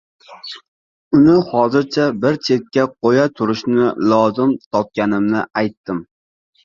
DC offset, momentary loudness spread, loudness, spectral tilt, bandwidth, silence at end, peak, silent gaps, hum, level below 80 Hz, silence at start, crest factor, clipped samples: under 0.1%; 14 LU; -16 LUFS; -7 dB/octave; 7.2 kHz; 0.6 s; 0 dBFS; 0.68-1.11 s, 4.66-4.71 s, 5.77-5.84 s; none; -54 dBFS; 0.3 s; 16 dB; under 0.1%